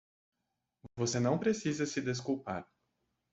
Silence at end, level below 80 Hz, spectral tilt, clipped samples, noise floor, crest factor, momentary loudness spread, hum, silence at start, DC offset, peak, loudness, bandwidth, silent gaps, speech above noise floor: 0.7 s; -70 dBFS; -5 dB/octave; under 0.1%; -86 dBFS; 18 dB; 11 LU; none; 0.85 s; under 0.1%; -18 dBFS; -34 LUFS; 8.2 kHz; none; 52 dB